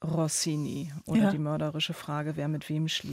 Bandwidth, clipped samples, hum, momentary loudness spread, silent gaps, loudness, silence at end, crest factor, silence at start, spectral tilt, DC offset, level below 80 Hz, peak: 16 kHz; under 0.1%; none; 7 LU; none; -30 LUFS; 0 s; 14 dB; 0 s; -5 dB/octave; under 0.1%; -64 dBFS; -16 dBFS